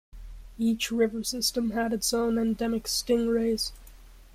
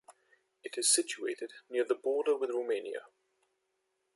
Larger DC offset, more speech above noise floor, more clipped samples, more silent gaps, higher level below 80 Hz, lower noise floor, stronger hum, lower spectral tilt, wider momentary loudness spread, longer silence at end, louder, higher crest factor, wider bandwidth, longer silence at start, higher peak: neither; second, 22 dB vs 48 dB; neither; neither; first, -48 dBFS vs under -90 dBFS; second, -49 dBFS vs -81 dBFS; neither; first, -3.5 dB/octave vs 0.5 dB/octave; second, 4 LU vs 16 LU; second, 0.05 s vs 1.1 s; first, -27 LUFS vs -32 LUFS; about the same, 16 dB vs 20 dB; first, 16 kHz vs 12 kHz; about the same, 0.15 s vs 0.1 s; about the same, -12 dBFS vs -14 dBFS